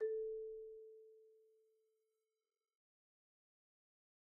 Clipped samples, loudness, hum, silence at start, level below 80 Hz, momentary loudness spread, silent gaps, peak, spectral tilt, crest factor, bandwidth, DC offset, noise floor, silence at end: under 0.1%; -48 LUFS; none; 0 s; -84 dBFS; 22 LU; none; -34 dBFS; 0 dB/octave; 18 dB; 1.9 kHz; under 0.1%; under -90 dBFS; 2.95 s